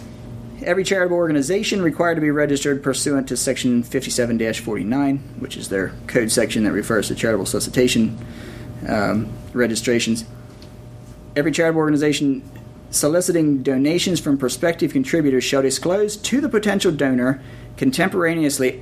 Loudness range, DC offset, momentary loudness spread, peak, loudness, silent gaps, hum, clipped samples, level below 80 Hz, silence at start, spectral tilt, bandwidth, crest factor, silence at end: 3 LU; under 0.1%; 14 LU; -2 dBFS; -19 LUFS; none; none; under 0.1%; -46 dBFS; 0 s; -4.5 dB/octave; 15.5 kHz; 18 dB; 0 s